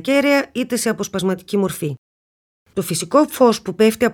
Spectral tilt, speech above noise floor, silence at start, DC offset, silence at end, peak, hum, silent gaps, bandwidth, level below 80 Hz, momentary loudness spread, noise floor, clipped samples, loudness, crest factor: -4.5 dB/octave; over 72 dB; 0.05 s; under 0.1%; 0 s; -2 dBFS; none; 1.98-2.66 s; 19 kHz; -56 dBFS; 11 LU; under -90 dBFS; under 0.1%; -18 LUFS; 16 dB